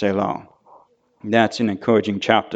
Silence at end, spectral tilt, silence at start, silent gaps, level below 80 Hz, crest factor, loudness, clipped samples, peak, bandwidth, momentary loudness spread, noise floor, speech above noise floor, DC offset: 0 s; -6 dB/octave; 0 s; none; -62 dBFS; 20 dB; -20 LUFS; under 0.1%; 0 dBFS; 8.2 kHz; 10 LU; -53 dBFS; 34 dB; under 0.1%